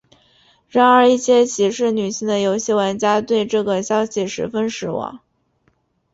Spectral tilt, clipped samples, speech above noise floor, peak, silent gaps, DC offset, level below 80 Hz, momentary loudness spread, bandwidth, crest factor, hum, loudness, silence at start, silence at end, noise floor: -4 dB/octave; under 0.1%; 46 dB; -2 dBFS; none; under 0.1%; -60 dBFS; 10 LU; 8 kHz; 16 dB; none; -18 LUFS; 0.75 s; 0.95 s; -63 dBFS